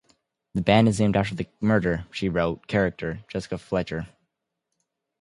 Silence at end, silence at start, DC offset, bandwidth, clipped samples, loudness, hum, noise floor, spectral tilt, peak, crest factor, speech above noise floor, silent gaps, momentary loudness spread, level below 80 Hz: 1.15 s; 0.55 s; under 0.1%; 11.5 kHz; under 0.1%; -25 LUFS; none; -81 dBFS; -6.5 dB/octave; -4 dBFS; 22 dB; 57 dB; none; 14 LU; -48 dBFS